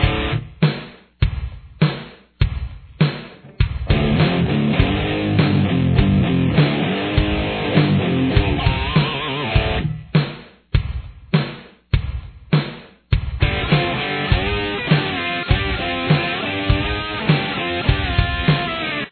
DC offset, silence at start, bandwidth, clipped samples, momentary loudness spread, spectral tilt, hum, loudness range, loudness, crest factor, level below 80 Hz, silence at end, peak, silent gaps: under 0.1%; 0 s; 4.5 kHz; under 0.1%; 11 LU; -10 dB/octave; none; 5 LU; -19 LUFS; 18 dB; -28 dBFS; 0 s; 0 dBFS; none